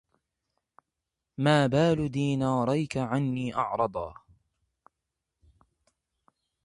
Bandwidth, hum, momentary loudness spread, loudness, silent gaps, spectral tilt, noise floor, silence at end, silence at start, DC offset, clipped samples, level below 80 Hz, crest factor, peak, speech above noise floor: 11 kHz; none; 8 LU; -27 LUFS; none; -7 dB/octave; -86 dBFS; 2.55 s; 1.4 s; under 0.1%; under 0.1%; -58 dBFS; 22 dB; -8 dBFS; 60 dB